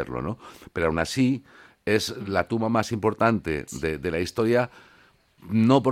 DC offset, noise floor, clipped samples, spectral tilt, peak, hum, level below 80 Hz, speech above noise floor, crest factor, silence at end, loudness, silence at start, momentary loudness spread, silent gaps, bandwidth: under 0.1%; -58 dBFS; under 0.1%; -6 dB/octave; -6 dBFS; none; -50 dBFS; 34 dB; 18 dB; 0 s; -25 LUFS; 0 s; 10 LU; none; 15.5 kHz